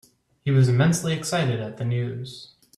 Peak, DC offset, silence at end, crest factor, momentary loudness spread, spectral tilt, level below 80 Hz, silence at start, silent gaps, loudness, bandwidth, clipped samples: -8 dBFS; under 0.1%; 0.3 s; 16 dB; 16 LU; -6 dB/octave; -58 dBFS; 0.45 s; none; -23 LUFS; 13.5 kHz; under 0.1%